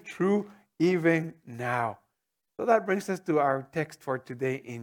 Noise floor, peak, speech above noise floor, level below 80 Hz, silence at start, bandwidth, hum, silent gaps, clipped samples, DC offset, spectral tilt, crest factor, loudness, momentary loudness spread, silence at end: -83 dBFS; -8 dBFS; 55 dB; -76 dBFS; 0.05 s; 17.5 kHz; none; none; under 0.1%; under 0.1%; -7 dB/octave; 20 dB; -28 LUFS; 10 LU; 0 s